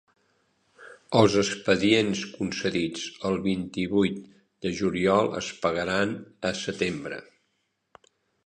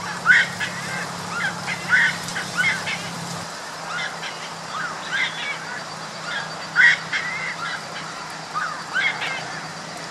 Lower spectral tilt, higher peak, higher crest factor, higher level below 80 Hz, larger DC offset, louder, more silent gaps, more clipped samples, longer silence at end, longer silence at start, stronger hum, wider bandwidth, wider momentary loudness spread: first, -5 dB/octave vs -2 dB/octave; about the same, -4 dBFS vs -2 dBFS; about the same, 22 dB vs 22 dB; first, -56 dBFS vs -66 dBFS; neither; second, -26 LUFS vs -23 LUFS; neither; neither; first, 1.25 s vs 0 s; first, 0.8 s vs 0 s; neither; second, 10.5 kHz vs 15 kHz; second, 10 LU vs 15 LU